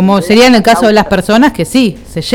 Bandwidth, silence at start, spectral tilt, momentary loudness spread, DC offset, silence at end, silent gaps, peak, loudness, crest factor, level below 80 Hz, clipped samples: 18 kHz; 0 s; -5 dB/octave; 6 LU; under 0.1%; 0 s; none; 0 dBFS; -8 LUFS; 8 dB; -34 dBFS; 0.3%